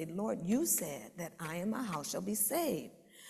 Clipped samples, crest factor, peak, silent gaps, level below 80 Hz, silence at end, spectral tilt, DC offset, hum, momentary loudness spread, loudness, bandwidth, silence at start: under 0.1%; 18 dB; -18 dBFS; none; -72 dBFS; 0 s; -4 dB/octave; under 0.1%; none; 12 LU; -35 LUFS; 14.5 kHz; 0 s